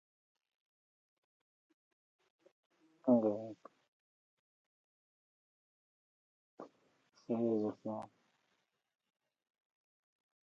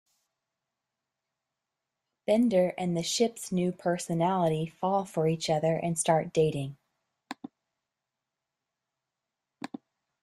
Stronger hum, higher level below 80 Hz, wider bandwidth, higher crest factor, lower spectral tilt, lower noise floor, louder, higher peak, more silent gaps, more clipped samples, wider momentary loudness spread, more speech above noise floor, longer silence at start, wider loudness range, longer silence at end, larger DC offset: neither; second, under -90 dBFS vs -68 dBFS; second, 6.4 kHz vs 13.5 kHz; first, 26 dB vs 20 dB; first, -9.5 dB/octave vs -5.5 dB/octave; second, -83 dBFS vs -88 dBFS; second, -36 LUFS vs -28 LUFS; second, -18 dBFS vs -10 dBFS; first, 3.88-6.58 s vs none; neither; first, 25 LU vs 18 LU; second, 48 dB vs 60 dB; first, 3.05 s vs 2.3 s; second, 4 LU vs 10 LU; second, 2.4 s vs 2.9 s; neither